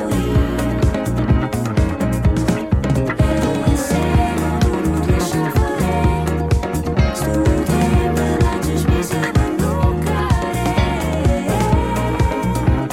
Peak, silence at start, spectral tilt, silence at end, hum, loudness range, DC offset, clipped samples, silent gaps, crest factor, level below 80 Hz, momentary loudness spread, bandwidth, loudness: -4 dBFS; 0 s; -6.5 dB/octave; 0 s; none; 1 LU; under 0.1%; under 0.1%; none; 12 dB; -22 dBFS; 2 LU; 16.5 kHz; -18 LUFS